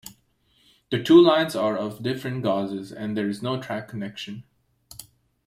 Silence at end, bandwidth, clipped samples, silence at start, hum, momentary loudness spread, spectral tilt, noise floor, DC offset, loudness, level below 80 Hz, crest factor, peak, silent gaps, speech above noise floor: 0.45 s; 15.5 kHz; under 0.1%; 0.05 s; none; 26 LU; -6 dB/octave; -64 dBFS; under 0.1%; -23 LUFS; -64 dBFS; 20 dB; -4 dBFS; none; 42 dB